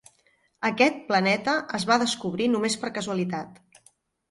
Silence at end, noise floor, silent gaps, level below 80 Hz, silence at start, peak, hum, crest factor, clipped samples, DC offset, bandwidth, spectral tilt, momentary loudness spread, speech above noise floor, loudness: 0.75 s; -66 dBFS; none; -66 dBFS; 0.6 s; -8 dBFS; none; 20 dB; under 0.1%; under 0.1%; 11.5 kHz; -4 dB/octave; 8 LU; 41 dB; -25 LUFS